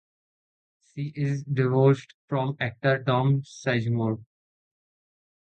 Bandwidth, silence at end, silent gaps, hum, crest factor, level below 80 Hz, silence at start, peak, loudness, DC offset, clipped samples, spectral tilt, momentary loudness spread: 8.4 kHz; 1.2 s; 2.14-2.28 s; none; 18 dB; -64 dBFS; 0.95 s; -8 dBFS; -26 LUFS; under 0.1%; under 0.1%; -7.5 dB/octave; 12 LU